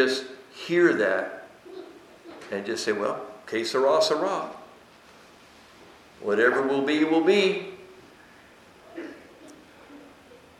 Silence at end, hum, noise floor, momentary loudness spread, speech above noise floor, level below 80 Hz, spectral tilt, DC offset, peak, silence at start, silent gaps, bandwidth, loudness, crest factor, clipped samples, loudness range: 0.5 s; none; -52 dBFS; 23 LU; 29 dB; -72 dBFS; -4 dB/octave; under 0.1%; -6 dBFS; 0 s; none; 14 kHz; -24 LUFS; 20 dB; under 0.1%; 3 LU